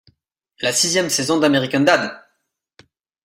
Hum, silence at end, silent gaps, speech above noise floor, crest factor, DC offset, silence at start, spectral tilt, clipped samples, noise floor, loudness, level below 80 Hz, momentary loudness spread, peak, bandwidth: none; 1.05 s; none; 55 dB; 18 dB; under 0.1%; 0.6 s; -3 dB/octave; under 0.1%; -72 dBFS; -17 LUFS; -62 dBFS; 6 LU; -2 dBFS; 16 kHz